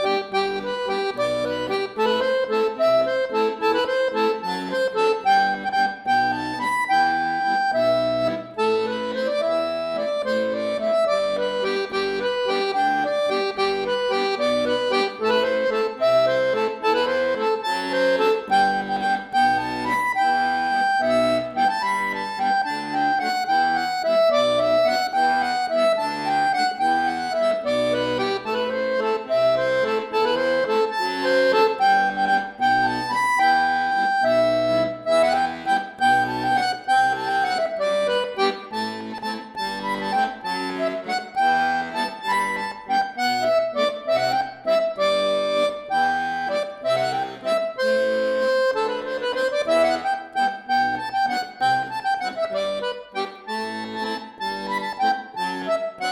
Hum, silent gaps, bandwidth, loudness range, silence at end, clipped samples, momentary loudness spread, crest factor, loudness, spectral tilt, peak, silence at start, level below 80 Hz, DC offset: none; none; 15 kHz; 4 LU; 0 s; under 0.1%; 6 LU; 14 dB; -22 LUFS; -4 dB/octave; -8 dBFS; 0 s; -60 dBFS; under 0.1%